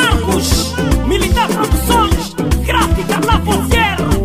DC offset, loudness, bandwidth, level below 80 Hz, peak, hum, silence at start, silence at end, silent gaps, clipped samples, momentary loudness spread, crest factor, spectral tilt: 0.7%; -14 LUFS; 16 kHz; -18 dBFS; 0 dBFS; none; 0 s; 0 s; none; under 0.1%; 3 LU; 12 dB; -4.5 dB/octave